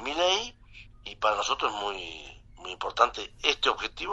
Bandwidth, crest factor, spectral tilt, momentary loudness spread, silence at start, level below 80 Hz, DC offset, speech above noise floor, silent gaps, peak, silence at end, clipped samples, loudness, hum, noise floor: 8.2 kHz; 26 dB; -1 dB/octave; 18 LU; 0 s; -54 dBFS; under 0.1%; 22 dB; none; -4 dBFS; 0 s; under 0.1%; -28 LUFS; none; -51 dBFS